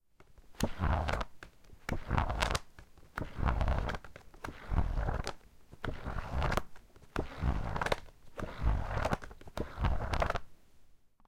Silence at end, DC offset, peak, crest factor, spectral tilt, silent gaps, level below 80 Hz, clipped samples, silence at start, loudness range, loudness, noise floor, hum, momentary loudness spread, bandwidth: 0.3 s; under 0.1%; -8 dBFS; 26 dB; -5.5 dB/octave; none; -38 dBFS; under 0.1%; 0.2 s; 2 LU; -37 LUFS; -58 dBFS; none; 12 LU; 16.5 kHz